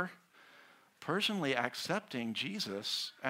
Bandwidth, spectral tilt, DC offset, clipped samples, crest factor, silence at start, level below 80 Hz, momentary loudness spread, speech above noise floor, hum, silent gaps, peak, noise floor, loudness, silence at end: 16 kHz; -3.5 dB/octave; under 0.1%; under 0.1%; 24 dB; 0 s; -84 dBFS; 6 LU; 26 dB; none; none; -14 dBFS; -62 dBFS; -36 LUFS; 0 s